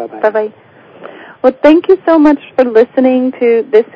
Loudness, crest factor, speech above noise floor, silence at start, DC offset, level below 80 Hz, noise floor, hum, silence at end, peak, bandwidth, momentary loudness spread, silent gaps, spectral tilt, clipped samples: -10 LUFS; 10 dB; 24 dB; 0 s; under 0.1%; -52 dBFS; -34 dBFS; none; 0.1 s; 0 dBFS; 6.8 kHz; 6 LU; none; -7 dB/octave; 1%